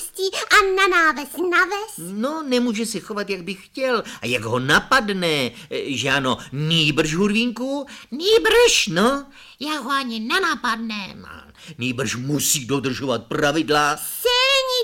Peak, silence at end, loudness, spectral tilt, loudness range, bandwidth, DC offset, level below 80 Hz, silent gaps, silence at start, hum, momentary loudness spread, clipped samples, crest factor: -4 dBFS; 0 s; -20 LUFS; -3 dB/octave; 5 LU; 17 kHz; under 0.1%; -48 dBFS; none; 0 s; none; 12 LU; under 0.1%; 18 dB